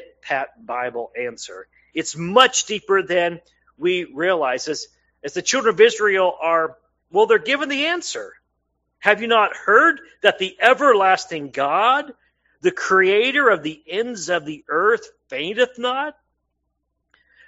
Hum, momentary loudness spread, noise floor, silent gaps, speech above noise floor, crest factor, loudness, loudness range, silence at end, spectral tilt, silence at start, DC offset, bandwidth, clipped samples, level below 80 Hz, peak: none; 14 LU; -74 dBFS; none; 55 dB; 20 dB; -19 LUFS; 4 LU; 1.35 s; -2.5 dB/octave; 0 s; under 0.1%; 8.2 kHz; under 0.1%; -66 dBFS; 0 dBFS